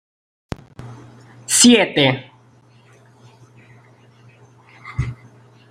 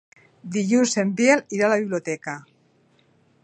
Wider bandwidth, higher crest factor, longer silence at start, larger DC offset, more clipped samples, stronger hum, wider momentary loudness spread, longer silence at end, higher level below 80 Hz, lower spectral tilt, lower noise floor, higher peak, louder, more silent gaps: first, 16 kHz vs 9.4 kHz; about the same, 22 dB vs 20 dB; first, 0.8 s vs 0.45 s; neither; neither; neither; first, 28 LU vs 15 LU; second, 0.55 s vs 1.05 s; first, -46 dBFS vs -74 dBFS; second, -3 dB/octave vs -4.5 dB/octave; second, -51 dBFS vs -61 dBFS; first, 0 dBFS vs -4 dBFS; first, -15 LUFS vs -21 LUFS; neither